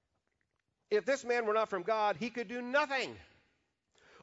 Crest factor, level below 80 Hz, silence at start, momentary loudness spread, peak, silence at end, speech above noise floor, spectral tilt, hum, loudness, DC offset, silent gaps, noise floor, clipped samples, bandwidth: 18 dB; -76 dBFS; 0.9 s; 7 LU; -18 dBFS; 1 s; 49 dB; -1.5 dB/octave; none; -34 LUFS; under 0.1%; none; -82 dBFS; under 0.1%; 7.6 kHz